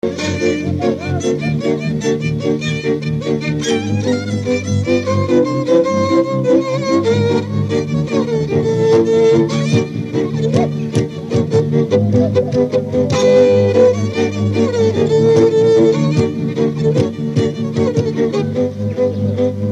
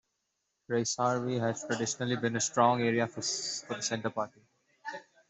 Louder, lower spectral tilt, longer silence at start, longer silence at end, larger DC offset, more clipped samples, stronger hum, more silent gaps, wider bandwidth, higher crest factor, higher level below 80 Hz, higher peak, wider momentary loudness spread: first, -15 LUFS vs -31 LUFS; first, -7 dB/octave vs -3.5 dB/octave; second, 0.05 s vs 0.7 s; second, 0 s vs 0.3 s; neither; neither; neither; neither; first, 11 kHz vs 8.2 kHz; second, 14 dB vs 22 dB; first, -46 dBFS vs -74 dBFS; first, 0 dBFS vs -10 dBFS; second, 7 LU vs 14 LU